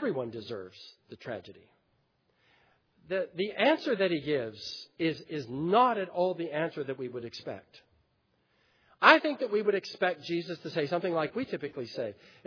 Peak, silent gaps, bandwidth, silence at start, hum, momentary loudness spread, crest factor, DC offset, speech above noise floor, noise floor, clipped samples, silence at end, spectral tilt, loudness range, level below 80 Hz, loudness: -4 dBFS; none; 5.4 kHz; 0 s; none; 17 LU; 28 dB; under 0.1%; 43 dB; -73 dBFS; under 0.1%; 0.35 s; -6 dB/octave; 7 LU; -76 dBFS; -30 LUFS